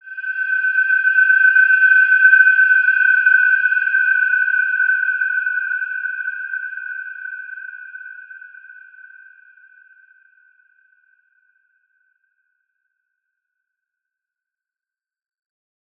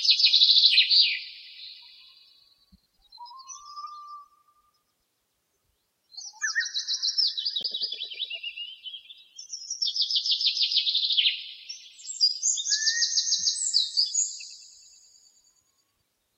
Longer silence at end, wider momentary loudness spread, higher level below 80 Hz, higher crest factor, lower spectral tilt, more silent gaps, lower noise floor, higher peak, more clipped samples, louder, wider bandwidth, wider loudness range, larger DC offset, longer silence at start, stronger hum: first, 7.25 s vs 1.7 s; second, 20 LU vs 24 LU; second, under -90 dBFS vs -80 dBFS; about the same, 18 dB vs 22 dB; first, 3.5 dB/octave vs 6 dB/octave; neither; first, under -90 dBFS vs -76 dBFS; first, -2 dBFS vs -6 dBFS; neither; first, -13 LUFS vs -22 LUFS; second, 3.5 kHz vs 15 kHz; about the same, 21 LU vs 22 LU; neither; about the same, 0.05 s vs 0 s; neither